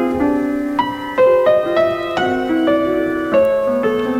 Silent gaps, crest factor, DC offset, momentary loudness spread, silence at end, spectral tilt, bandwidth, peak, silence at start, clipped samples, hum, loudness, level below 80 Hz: none; 12 dB; under 0.1%; 5 LU; 0 s; -6.5 dB/octave; 15.5 kHz; -4 dBFS; 0 s; under 0.1%; none; -16 LUFS; -46 dBFS